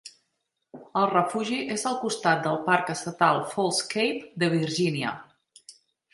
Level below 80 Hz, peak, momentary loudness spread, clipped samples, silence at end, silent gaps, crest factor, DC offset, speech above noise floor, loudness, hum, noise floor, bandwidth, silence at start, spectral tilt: -72 dBFS; -6 dBFS; 7 LU; under 0.1%; 0.45 s; none; 22 dB; under 0.1%; 53 dB; -26 LUFS; none; -79 dBFS; 11.5 kHz; 0.05 s; -4 dB/octave